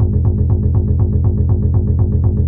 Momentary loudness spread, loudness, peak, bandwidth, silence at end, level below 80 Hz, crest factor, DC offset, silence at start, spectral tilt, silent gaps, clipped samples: 1 LU; -15 LUFS; -2 dBFS; 1.4 kHz; 0 s; -20 dBFS; 10 dB; under 0.1%; 0 s; -15.5 dB/octave; none; under 0.1%